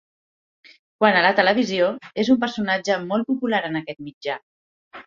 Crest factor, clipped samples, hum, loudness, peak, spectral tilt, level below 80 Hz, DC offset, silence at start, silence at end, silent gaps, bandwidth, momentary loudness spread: 20 dB; under 0.1%; none; -21 LUFS; -2 dBFS; -5 dB/octave; -66 dBFS; under 0.1%; 1 s; 0.05 s; 4.14-4.21 s, 4.43-4.91 s; 7.4 kHz; 14 LU